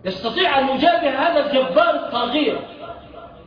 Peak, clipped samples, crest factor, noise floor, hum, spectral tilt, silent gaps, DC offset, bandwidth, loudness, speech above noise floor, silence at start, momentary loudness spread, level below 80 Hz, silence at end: -4 dBFS; under 0.1%; 14 dB; -39 dBFS; none; -6 dB/octave; none; under 0.1%; 5.2 kHz; -18 LUFS; 21 dB; 0.05 s; 18 LU; -52 dBFS; 0.05 s